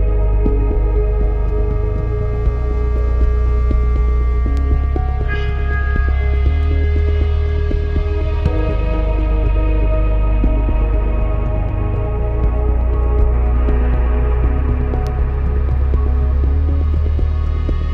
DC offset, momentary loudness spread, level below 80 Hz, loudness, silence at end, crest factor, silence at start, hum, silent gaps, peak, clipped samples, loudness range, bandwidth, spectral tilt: under 0.1%; 3 LU; -16 dBFS; -18 LUFS; 0 s; 12 dB; 0 s; none; none; -2 dBFS; under 0.1%; 1 LU; 4.2 kHz; -9.5 dB/octave